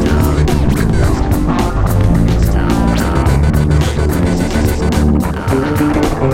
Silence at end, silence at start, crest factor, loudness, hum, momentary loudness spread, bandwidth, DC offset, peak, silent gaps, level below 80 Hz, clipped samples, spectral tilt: 0 s; 0 s; 10 dB; -13 LUFS; none; 2 LU; 16.5 kHz; under 0.1%; 0 dBFS; none; -16 dBFS; under 0.1%; -7 dB/octave